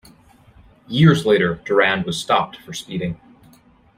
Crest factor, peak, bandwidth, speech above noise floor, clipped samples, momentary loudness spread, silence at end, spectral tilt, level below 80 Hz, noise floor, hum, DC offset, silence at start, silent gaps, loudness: 18 dB; -2 dBFS; 15 kHz; 34 dB; under 0.1%; 14 LU; 0.8 s; -6 dB/octave; -52 dBFS; -52 dBFS; none; under 0.1%; 0.9 s; none; -18 LUFS